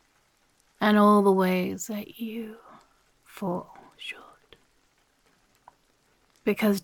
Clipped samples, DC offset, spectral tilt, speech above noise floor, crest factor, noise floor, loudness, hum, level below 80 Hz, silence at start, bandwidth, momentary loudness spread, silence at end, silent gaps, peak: under 0.1%; under 0.1%; -6 dB/octave; 42 dB; 20 dB; -67 dBFS; -25 LUFS; none; -70 dBFS; 0.8 s; 17.5 kHz; 20 LU; 0.05 s; none; -8 dBFS